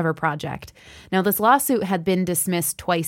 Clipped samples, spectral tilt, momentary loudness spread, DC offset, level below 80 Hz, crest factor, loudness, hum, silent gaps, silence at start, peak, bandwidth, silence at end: under 0.1%; -4.5 dB/octave; 11 LU; under 0.1%; -56 dBFS; 18 dB; -21 LUFS; none; none; 0 s; -4 dBFS; 17 kHz; 0 s